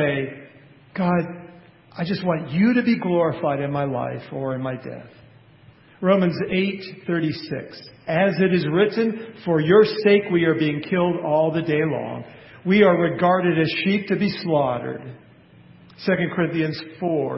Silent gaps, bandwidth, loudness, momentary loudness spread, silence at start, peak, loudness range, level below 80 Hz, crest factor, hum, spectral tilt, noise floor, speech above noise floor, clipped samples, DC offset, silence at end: none; 5.8 kHz; -21 LUFS; 15 LU; 0 s; -2 dBFS; 6 LU; -58 dBFS; 18 dB; none; -11.5 dB/octave; -50 dBFS; 30 dB; under 0.1%; under 0.1%; 0 s